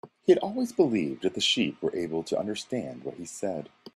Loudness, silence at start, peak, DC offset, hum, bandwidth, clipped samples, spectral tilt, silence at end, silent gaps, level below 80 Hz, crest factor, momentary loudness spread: -28 LUFS; 0.05 s; -8 dBFS; under 0.1%; none; 13 kHz; under 0.1%; -4 dB/octave; 0.05 s; none; -68 dBFS; 20 dB; 12 LU